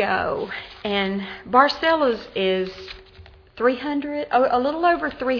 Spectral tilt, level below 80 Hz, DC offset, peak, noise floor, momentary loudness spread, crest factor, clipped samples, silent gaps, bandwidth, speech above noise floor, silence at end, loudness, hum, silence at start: -6 dB/octave; -52 dBFS; under 0.1%; -2 dBFS; -47 dBFS; 13 LU; 20 dB; under 0.1%; none; 5.4 kHz; 25 dB; 0 s; -22 LUFS; none; 0 s